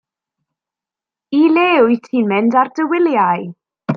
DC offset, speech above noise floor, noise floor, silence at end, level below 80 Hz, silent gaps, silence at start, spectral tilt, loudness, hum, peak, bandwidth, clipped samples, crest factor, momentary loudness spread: under 0.1%; 74 dB; -88 dBFS; 0 s; -66 dBFS; none; 1.3 s; -7.5 dB/octave; -14 LUFS; none; -2 dBFS; 6.6 kHz; under 0.1%; 14 dB; 9 LU